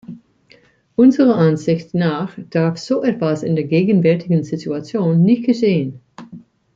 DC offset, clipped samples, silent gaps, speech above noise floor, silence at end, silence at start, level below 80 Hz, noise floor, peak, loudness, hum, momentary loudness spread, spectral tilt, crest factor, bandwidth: under 0.1%; under 0.1%; none; 36 dB; 0.35 s; 0.1 s; -60 dBFS; -52 dBFS; -2 dBFS; -17 LUFS; none; 10 LU; -8 dB/octave; 14 dB; 7.6 kHz